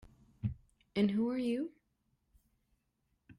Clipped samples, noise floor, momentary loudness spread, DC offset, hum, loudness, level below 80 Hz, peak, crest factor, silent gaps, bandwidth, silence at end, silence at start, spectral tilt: under 0.1%; -80 dBFS; 12 LU; under 0.1%; none; -36 LUFS; -62 dBFS; -20 dBFS; 18 dB; none; 11 kHz; 0.05 s; 0.45 s; -8 dB/octave